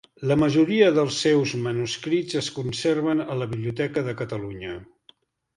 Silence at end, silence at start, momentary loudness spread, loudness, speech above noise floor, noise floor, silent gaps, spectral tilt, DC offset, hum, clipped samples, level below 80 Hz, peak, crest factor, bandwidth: 0.75 s; 0.2 s; 13 LU; -23 LUFS; 35 dB; -59 dBFS; none; -5.5 dB/octave; under 0.1%; none; under 0.1%; -56 dBFS; -4 dBFS; 18 dB; 11.5 kHz